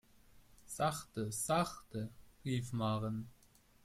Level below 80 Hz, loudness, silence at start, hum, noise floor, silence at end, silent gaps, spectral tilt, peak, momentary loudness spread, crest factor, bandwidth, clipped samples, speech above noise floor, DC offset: -64 dBFS; -39 LUFS; 0.35 s; none; -63 dBFS; 0.5 s; none; -5 dB/octave; -20 dBFS; 13 LU; 20 dB; 16 kHz; under 0.1%; 25 dB; under 0.1%